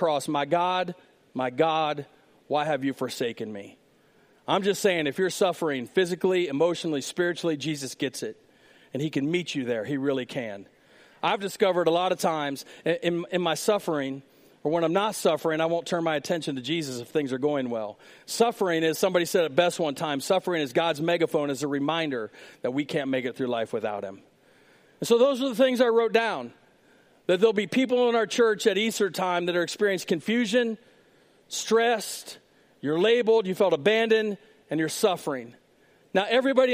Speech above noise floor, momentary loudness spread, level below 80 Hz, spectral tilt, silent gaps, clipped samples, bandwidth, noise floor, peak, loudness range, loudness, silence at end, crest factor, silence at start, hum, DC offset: 35 dB; 12 LU; -76 dBFS; -4.5 dB/octave; none; under 0.1%; 15.5 kHz; -61 dBFS; -8 dBFS; 5 LU; -26 LUFS; 0 s; 18 dB; 0 s; none; under 0.1%